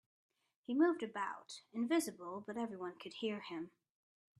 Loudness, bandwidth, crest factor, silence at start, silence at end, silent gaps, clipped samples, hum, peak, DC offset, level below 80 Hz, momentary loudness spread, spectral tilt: -40 LUFS; 13 kHz; 20 dB; 0.7 s; 0.7 s; none; under 0.1%; none; -22 dBFS; under 0.1%; -88 dBFS; 14 LU; -4 dB/octave